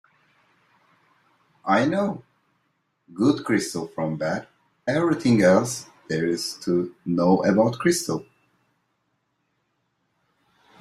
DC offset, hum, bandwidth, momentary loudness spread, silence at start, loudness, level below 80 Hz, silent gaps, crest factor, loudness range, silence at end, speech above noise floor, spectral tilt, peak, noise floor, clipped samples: under 0.1%; none; 14.5 kHz; 13 LU; 1.65 s; -23 LUFS; -62 dBFS; none; 20 dB; 5 LU; 2.6 s; 51 dB; -5.5 dB/octave; -6 dBFS; -73 dBFS; under 0.1%